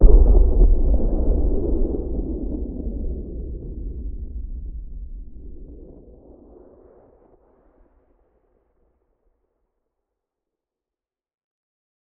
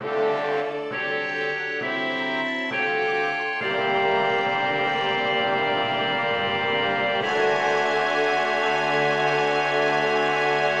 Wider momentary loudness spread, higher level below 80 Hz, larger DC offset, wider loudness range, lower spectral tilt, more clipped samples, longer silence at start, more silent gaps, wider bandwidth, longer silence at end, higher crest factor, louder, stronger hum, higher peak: first, 25 LU vs 4 LU; first, -22 dBFS vs -68 dBFS; neither; first, 24 LU vs 3 LU; first, -14 dB/octave vs -4 dB/octave; neither; about the same, 0 s vs 0 s; neither; second, 1.3 kHz vs 9.8 kHz; first, 6.15 s vs 0 s; first, 20 dB vs 14 dB; about the same, -24 LUFS vs -23 LUFS; neither; first, 0 dBFS vs -10 dBFS